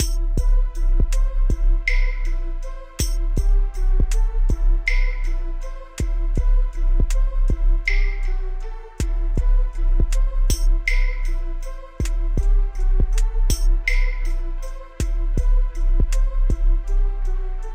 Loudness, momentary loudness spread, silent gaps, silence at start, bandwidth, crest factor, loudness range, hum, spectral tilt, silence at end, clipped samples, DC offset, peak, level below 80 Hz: -24 LUFS; 8 LU; none; 0 s; 15 kHz; 10 dB; 0 LU; none; -4.5 dB/octave; 0 s; under 0.1%; under 0.1%; -8 dBFS; -18 dBFS